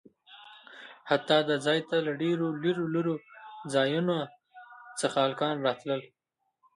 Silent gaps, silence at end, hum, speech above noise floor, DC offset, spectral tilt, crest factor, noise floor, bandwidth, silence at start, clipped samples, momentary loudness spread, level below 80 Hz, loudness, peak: none; 0.7 s; none; 47 dB; under 0.1%; -5 dB/octave; 20 dB; -75 dBFS; 11.5 kHz; 0.3 s; under 0.1%; 22 LU; -78 dBFS; -29 LUFS; -10 dBFS